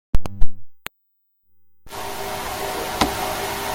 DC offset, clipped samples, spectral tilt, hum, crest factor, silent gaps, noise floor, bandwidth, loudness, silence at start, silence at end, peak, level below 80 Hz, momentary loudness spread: under 0.1%; under 0.1%; -3.5 dB/octave; none; 18 dB; none; -68 dBFS; 17 kHz; -26 LUFS; 0.15 s; 0 s; 0 dBFS; -30 dBFS; 17 LU